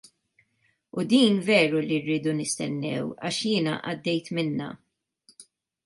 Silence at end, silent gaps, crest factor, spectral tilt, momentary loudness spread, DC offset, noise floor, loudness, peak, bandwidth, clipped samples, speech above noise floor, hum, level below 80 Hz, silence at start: 0.45 s; none; 20 dB; -4.5 dB/octave; 10 LU; under 0.1%; -71 dBFS; -25 LUFS; -8 dBFS; 11.5 kHz; under 0.1%; 46 dB; none; -70 dBFS; 0.95 s